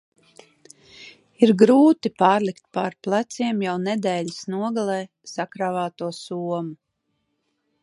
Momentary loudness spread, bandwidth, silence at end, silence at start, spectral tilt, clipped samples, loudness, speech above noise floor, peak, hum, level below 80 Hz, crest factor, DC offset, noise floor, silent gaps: 15 LU; 11.5 kHz; 1.1 s; 1 s; -6 dB/octave; under 0.1%; -22 LUFS; 53 dB; -2 dBFS; none; -72 dBFS; 22 dB; under 0.1%; -74 dBFS; none